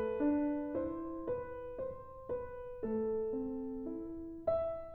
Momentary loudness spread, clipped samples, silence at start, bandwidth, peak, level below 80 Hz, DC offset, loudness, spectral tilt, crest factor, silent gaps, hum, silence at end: 10 LU; under 0.1%; 0 s; 4.3 kHz; -22 dBFS; -58 dBFS; under 0.1%; -39 LUFS; -10.5 dB/octave; 16 dB; none; none; 0 s